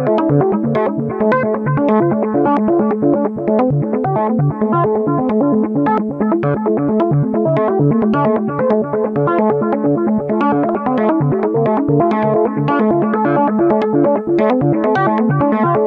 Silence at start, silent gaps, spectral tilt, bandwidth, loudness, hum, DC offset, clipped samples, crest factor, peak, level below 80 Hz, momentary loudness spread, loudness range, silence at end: 0 s; none; -11 dB/octave; 5 kHz; -15 LUFS; none; under 0.1%; under 0.1%; 12 dB; -2 dBFS; -50 dBFS; 3 LU; 1 LU; 0 s